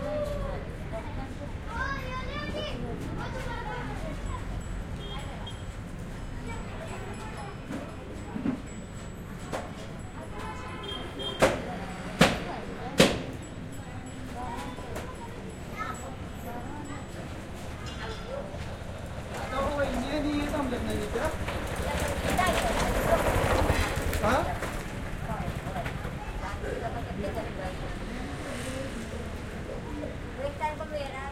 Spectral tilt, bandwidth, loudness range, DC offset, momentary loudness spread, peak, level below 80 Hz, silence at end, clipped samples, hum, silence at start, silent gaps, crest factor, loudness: -5 dB/octave; 16.5 kHz; 10 LU; under 0.1%; 14 LU; -4 dBFS; -40 dBFS; 0 s; under 0.1%; none; 0 s; none; 28 dB; -33 LUFS